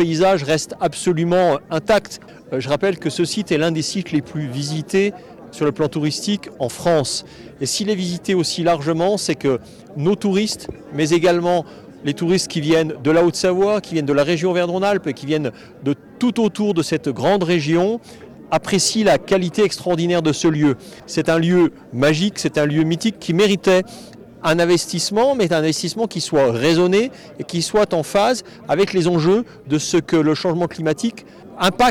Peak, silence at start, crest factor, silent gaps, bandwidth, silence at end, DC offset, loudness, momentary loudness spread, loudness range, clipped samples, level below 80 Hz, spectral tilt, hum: -8 dBFS; 0 s; 10 dB; none; 17 kHz; 0 s; under 0.1%; -19 LUFS; 9 LU; 3 LU; under 0.1%; -52 dBFS; -5 dB/octave; none